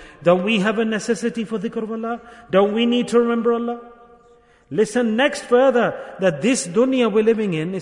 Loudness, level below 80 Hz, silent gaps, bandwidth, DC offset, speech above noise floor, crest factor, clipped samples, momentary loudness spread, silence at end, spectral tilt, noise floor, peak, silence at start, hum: -19 LUFS; -60 dBFS; none; 11 kHz; under 0.1%; 34 dB; 16 dB; under 0.1%; 9 LU; 0 s; -5 dB/octave; -52 dBFS; -4 dBFS; 0 s; none